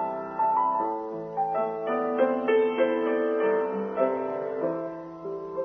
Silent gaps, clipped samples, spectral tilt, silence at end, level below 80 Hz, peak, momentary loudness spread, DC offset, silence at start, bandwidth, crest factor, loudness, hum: none; under 0.1%; -8 dB/octave; 0 s; -70 dBFS; -12 dBFS; 10 LU; under 0.1%; 0 s; 3.8 kHz; 16 dB; -27 LUFS; none